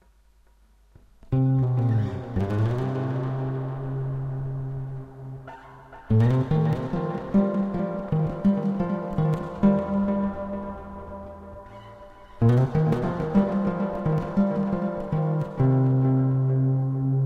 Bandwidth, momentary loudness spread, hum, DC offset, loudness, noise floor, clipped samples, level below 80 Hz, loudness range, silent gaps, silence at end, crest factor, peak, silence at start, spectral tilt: 4.9 kHz; 17 LU; none; under 0.1%; -25 LUFS; -58 dBFS; under 0.1%; -46 dBFS; 5 LU; none; 0 s; 16 dB; -8 dBFS; 1.3 s; -10.5 dB/octave